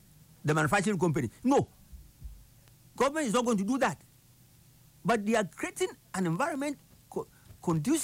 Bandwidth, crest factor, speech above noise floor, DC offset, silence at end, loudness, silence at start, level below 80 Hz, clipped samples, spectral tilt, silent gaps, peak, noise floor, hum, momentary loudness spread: 16 kHz; 16 dB; 31 dB; under 0.1%; 0 s; -30 LUFS; 0.45 s; -58 dBFS; under 0.1%; -5.5 dB/octave; none; -16 dBFS; -60 dBFS; none; 17 LU